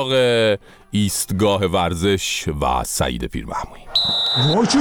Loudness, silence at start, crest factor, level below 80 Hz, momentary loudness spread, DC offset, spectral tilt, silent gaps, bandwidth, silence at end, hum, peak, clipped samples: -19 LUFS; 0 s; 14 dB; -36 dBFS; 10 LU; under 0.1%; -4 dB/octave; none; 19.5 kHz; 0 s; none; -6 dBFS; under 0.1%